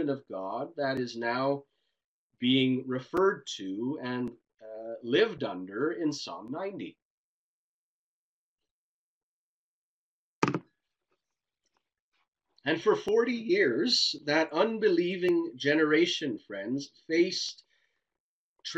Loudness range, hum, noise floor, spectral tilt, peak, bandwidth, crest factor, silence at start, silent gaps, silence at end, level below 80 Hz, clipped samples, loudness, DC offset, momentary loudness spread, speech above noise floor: 13 LU; none; under -90 dBFS; -4.5 dB/octave; -8 dBFS; 8.6 kHz; 22 dB; 0 s; 2.04-2.30 s, 7.02-8.58 s, 8.71-10.42 s, 12.02-12.12 s, 12.28-12.32 s, 18.20-18.56 s; 0 s; -74 dBFS; under 0.1%; -29 LUFS; under 0.1%; 12 LU; over 61 dB